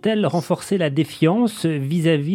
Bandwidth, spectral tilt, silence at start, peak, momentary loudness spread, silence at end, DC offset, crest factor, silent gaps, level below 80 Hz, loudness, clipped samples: 15.5 kHz; -6.5 dB/octave; 0.05 s; -4 dBFS; 4 LU; 0 s; under 0.1%; 16 dB; none; -64 dBFS; -20 LUFS; under 0.1%